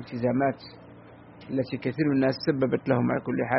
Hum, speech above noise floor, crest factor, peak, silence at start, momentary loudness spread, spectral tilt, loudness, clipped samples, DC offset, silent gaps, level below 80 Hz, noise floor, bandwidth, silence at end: none; 23 dB; 18 dB; -8 dBFS; 0 s; 11 LU; -6 dB/octave; -27 LUFS; under 0.1%; under 0.1%; none; -62 dBFS; -48 dBFS; 5.8 kHz; 0 s